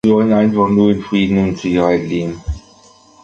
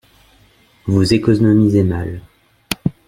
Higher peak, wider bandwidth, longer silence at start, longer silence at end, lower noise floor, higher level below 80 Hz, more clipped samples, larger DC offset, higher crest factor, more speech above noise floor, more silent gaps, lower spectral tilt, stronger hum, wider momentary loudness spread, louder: about the same, -2 dBFS vs 0 dBFS; second, 7.4 kHz vs 16 kHz; second, 0.05 s vs 0.85 s; first, 0.65 s vs 0.15 s; second, -46 dBFS vs -52 dBFS; first, -34 dBFS vs -42 dBFS; neither; neither; about the same, 12 dB vs 16 dB; second, 32 dB vs 38 dB; neither; about the same, -7.5 dB/octave vs -7 dB/octave; neither; second, 13 LU vs 16 LU; about the same, -15 LUFS vs -15 LUFS